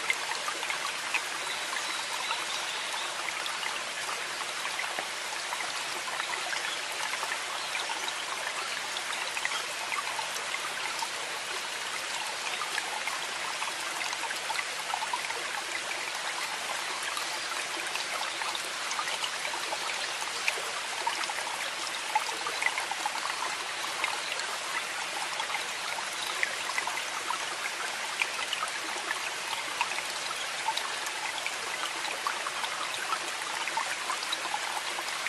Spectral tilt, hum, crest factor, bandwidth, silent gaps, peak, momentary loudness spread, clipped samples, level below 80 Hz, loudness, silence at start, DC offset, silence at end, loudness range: 1 dB/octave; none; 24 dB; 13 kHz; none; -8 dBFS; 2 LU; under 0.1%; -78 dBFS; -31 LUFS; 0 s; under 0.1%; 0 s; 1 LU